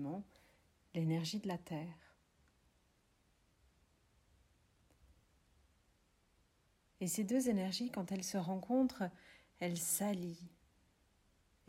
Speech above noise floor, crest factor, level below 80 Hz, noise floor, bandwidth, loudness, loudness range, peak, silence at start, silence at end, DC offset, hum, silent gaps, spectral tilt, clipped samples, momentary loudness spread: 36 dB; 18 dB; -74 dBFS; -75 dBFS; 16 kHz; -40 LUFS; 12 LU; -24 dBFS; 0 s; 1.2 s; under 0.1%; none; none; -5 dB/octave; under 0.1%; 13 LU